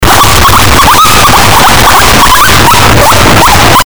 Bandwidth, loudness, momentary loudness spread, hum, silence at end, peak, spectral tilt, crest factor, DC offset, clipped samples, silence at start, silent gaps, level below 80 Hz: over 20 kHz; -2 LUFS; 1 LU; none; 0 s; 0 dBFS; -3 dB/octave; 4 dB; 30%; 10%; 0 s; none; -14 dBFS